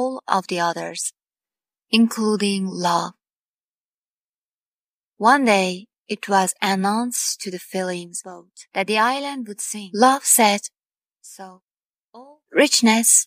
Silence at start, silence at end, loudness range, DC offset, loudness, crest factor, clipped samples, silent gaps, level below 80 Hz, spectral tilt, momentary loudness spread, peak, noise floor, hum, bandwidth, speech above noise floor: 0 s; 0 s; 4 LU; under 0.1%; -19 LUFS; 20 dB; under 0.1%; 3.36-5.12 s, 5.98-6.04 s, 11.62-12.09 s; -80 dBFS; -2.5 dB/octave; 16 LU; -2 dBFS; under -90 dBFS; none; 15.5 kHz; over 70 dB